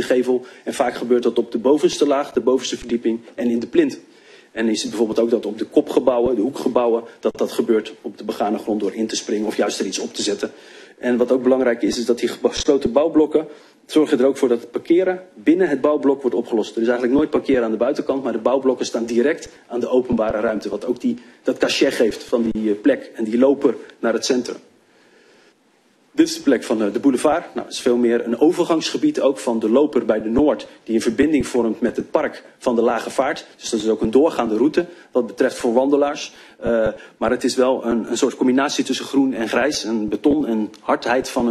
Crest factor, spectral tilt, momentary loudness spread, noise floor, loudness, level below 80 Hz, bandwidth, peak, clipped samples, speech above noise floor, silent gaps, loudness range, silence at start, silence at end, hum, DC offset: 18 dB; -4.5 dB/octave; 7 LU; -58 dBFS; -19 LUFS; -50 dBFS; 13 kHz; 0 dBFS; under 0.1%; 39 dB; none; 3 LU; 0 s; 0 s; none; under 0.1%